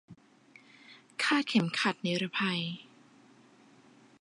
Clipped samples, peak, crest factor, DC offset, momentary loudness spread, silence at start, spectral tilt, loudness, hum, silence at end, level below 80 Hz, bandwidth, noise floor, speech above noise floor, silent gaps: under 0.1%; -12 dBFS; 22 dB; under 0.1%; 12 LU; 0.1 s; -4.5 dB/octave; -30 LUFS; none; 1.35 s; -82 dBFS; 11 kHz; -60 dBFS; 29 dB; none